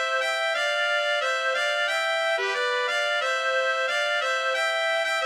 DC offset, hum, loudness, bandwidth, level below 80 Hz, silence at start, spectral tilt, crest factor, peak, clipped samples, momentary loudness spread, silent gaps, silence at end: under 0.1%; none; -24 LUFS; 16 kHz; -80 dBFS; 0 s; 2.5 dB/octave; 12 dB; -12 dBFS; under 0.1%; 1 LU; none; 0 s